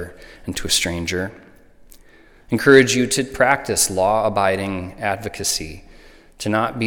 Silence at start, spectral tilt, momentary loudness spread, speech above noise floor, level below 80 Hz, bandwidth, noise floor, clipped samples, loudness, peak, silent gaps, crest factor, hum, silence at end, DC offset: 0 s; -3.5 dB/octave; 16 LU; 29 dB; -44 dBFS; 19 kHz; -48 dBFS; under 0.1%; -19 LUFS; 0 dBFS; none; 20 dB; none; 0 s; under 0.1%